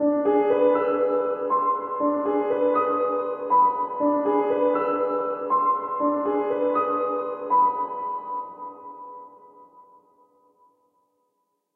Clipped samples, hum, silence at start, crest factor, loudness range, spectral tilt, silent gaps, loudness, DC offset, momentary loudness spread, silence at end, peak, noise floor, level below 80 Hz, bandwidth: under 0.1%; none; 0 s; 16 dB; 7 LU; -9 dB/octave; none; -23 LUFS; under 0.1%; 12 LU; 1.95 s; -8 dBFS; -74 dBFS; -76 dBFS; 4 kHz